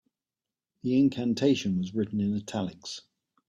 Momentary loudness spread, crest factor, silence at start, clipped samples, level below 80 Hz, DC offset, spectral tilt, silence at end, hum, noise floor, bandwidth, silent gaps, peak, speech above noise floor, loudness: 14 LU; 16 dB; 0.85 s; under 0.1%; -66 dBFS; under 0.1%; -6.5 dB/octave; 0.5 s; none; under -90 dBFS; 9.6 kHz; none; -12 dBFS; over 63 dB; -28 LUFS